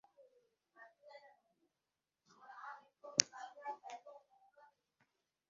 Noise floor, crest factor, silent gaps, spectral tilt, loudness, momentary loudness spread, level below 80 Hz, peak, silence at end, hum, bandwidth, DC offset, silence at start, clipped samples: under -90 dBFS; 44 dB; none; 1 dB/octave; -39 LUFS; 28 LU; under -90 dBFS; -4 dBFS; 0.8 s; none; 7.4 kHz; under 0.1%; 0.2 s; under 0.1%